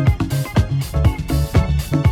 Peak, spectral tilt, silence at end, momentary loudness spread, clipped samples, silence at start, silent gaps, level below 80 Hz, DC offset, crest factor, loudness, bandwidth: -2 dBFS; -7 dB/octave; 0 s; 3 LU; under 0.1%; 0 s; none; -22 dBFS; under 0.1%; 16 dB; -19 LUFS; 17.5 kHz